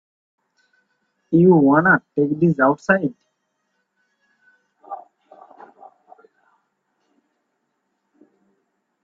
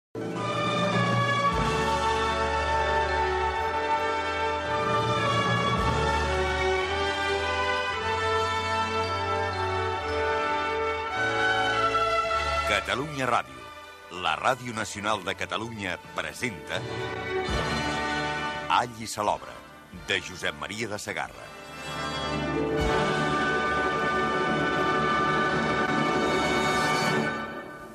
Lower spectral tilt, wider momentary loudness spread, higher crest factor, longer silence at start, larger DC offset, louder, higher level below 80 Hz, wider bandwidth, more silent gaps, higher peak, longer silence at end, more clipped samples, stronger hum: first, -9.5 dB/octave vs -4.5 dB/octave; first, 24 LU vs 8 LU; about the same, 22 dB vs 18 dB; first, 1.3 s vs 0.15 s; neither; first, -17 LUFS vs -26 LUFS; second, -64 dBFS vs -44 dBFS; second, 7.2 kHz vs 13.5 kHz; neither; first, 0 dBFS vs -10 dBFS; first, 4.05 s vs 0 s; neither; neither